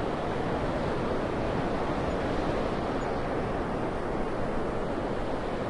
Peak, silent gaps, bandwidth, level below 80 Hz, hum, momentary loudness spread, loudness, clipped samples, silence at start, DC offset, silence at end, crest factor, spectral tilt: -16 dBFS; none; 11 kHz; -40 dBFS; none; 2 LU; -31 LUFS; under 0.1%; 0 s; under 0.1%; 0 s; 14 dB; -7 dB/octave